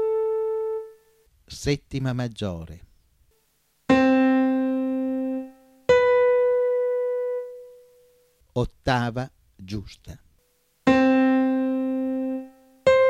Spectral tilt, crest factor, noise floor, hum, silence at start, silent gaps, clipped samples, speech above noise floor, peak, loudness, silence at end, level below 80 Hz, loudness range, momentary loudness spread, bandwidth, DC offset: -6.5 dB/octave; 18 dB; -67 dBFS; none; 0 s; none; under 0.1%; 39 dB; -6 dBFS; -23 LUFS; 0 s; -50 dBFS; 9 LU; 19 LU; 9.8 kHz; under 0.1%